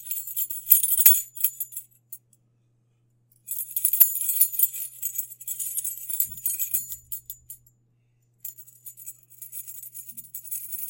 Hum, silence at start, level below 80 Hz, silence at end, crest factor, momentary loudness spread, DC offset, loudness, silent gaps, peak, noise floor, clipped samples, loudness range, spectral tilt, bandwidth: none; 0 s; -68 dBFS; 0 s; 28 dB; 24 LU; under 0.1%; -22 LUFS; none; 0 dBFS; -66 dBFS; under 0.1%; 16 LU; 2 dB/octave; 17.5 kHz